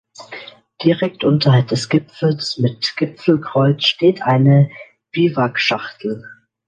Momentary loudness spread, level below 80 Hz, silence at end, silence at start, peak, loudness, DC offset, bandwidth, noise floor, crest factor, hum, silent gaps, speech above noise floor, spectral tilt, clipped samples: 13 LU; -60 dBFS; 0.35 s; 0.2 s; 0 dBFS; -17 LUFS; under 0.1%; 9.2 kHz; -37 dBFS; 16 dB; none; none; 21 dB; -6.5 dB/octave; under 0.1%